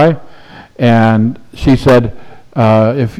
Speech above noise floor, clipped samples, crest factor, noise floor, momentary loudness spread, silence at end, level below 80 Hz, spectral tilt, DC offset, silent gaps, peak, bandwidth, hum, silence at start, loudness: 26 dB; under 0.1%; 10 dB; -35 dBFS; 12 LU; 0 s; -32 dBFS; -8 dB/octave; under 0.1%; none; 0 dBFS; 12 kHz; none; 0 s; -11 LUFS